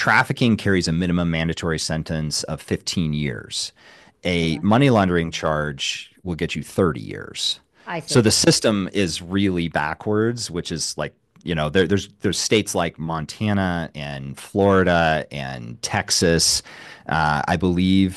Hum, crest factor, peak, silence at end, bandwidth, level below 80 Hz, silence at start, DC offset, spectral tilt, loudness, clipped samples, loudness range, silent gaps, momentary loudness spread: none; 18 dB; -2 dBFS; 0 s; 12.5 kHz; -44 dBFS; 0 s; under 0.1%; -4.5 dB/octave; -21 LUFS; under 0.1%; 3 LU; none; 14 LU